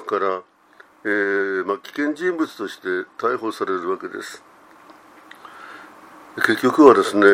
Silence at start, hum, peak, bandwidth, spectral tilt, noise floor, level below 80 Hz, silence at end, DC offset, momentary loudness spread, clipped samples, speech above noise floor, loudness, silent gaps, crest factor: 0 s; none; 0 dBFS; 16 kHz; -5 dB/octave; -51 dBFS; -68 dBFS; 0 s; under 0.1%; 26 LU; under 0.1%; 32 dB; -20 LUFS; none; 20 dB